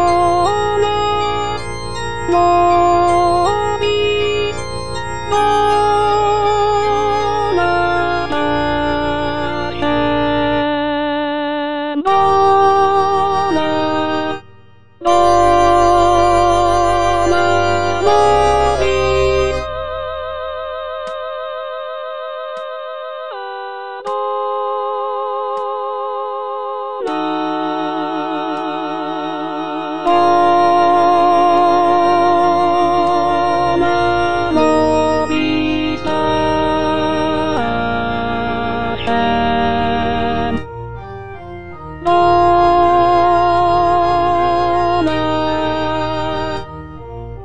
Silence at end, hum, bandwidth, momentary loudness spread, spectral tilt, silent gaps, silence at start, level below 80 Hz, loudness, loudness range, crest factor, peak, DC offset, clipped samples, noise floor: 0 s; none; 10 kHz; 13 LU; -5.5 dB/octave; none; 0 s; -36 dBFS; -15 LUFS; 8 LU; 14 dB; 0 dBFS; under 0.1%; under 0.1%; -46 dBFS